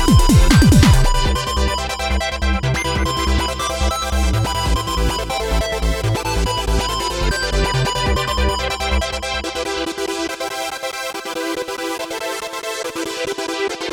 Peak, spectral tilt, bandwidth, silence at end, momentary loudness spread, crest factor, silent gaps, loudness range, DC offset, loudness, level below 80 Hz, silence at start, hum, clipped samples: 0 dBFS; -4.5 dB/octave; 19 kHz; 0 s; 11 LU; 16 dB; none; 7 LU; under 0.1%; -19 LUFS; -22 dBFS; 0 s; none; under 0.1%